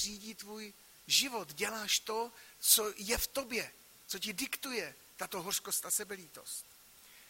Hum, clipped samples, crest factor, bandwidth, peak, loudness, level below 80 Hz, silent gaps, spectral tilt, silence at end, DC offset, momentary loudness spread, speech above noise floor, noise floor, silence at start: none; under 0.1%; 26 dB; 16.5 kHz; -12 dBFS; -34 LUFS; -62 dBFS; none; -0.5 dB/octave; 0 s; under 0.1%; 18 LU; 22 dB; -59 dBFS; 0 s